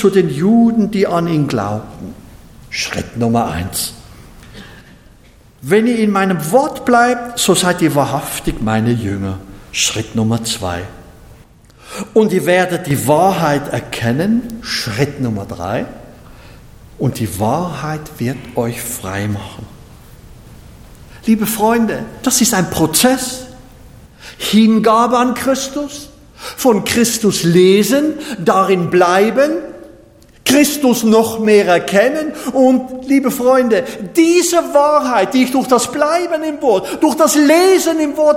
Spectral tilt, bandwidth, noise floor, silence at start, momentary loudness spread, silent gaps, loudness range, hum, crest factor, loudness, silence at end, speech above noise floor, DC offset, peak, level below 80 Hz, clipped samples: -4.5 dB/octave; 17 kHz; -44 dBFS; 0 s; 12 LU; none; 8 LU; none; 14 dB; -14 LUFS; 0 s; 31 dB; under 0.1%; 0 dBFS; -42 dBFS; under 0.1%